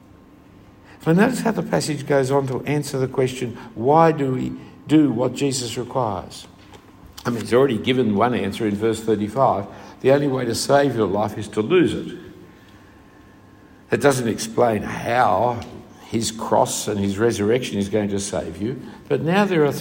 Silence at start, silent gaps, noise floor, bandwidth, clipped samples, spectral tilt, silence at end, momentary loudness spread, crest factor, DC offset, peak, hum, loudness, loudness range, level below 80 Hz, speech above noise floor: 1 s; none; -47 dBFS; 16.5 kHz; under 0.1%; -5.5 dB/octave; 0 s; 11 LU; 20 dB; under 0.1%; -2 dBFS; none; -21 LUFS; 3 LU; -54 dBFS; 28 dB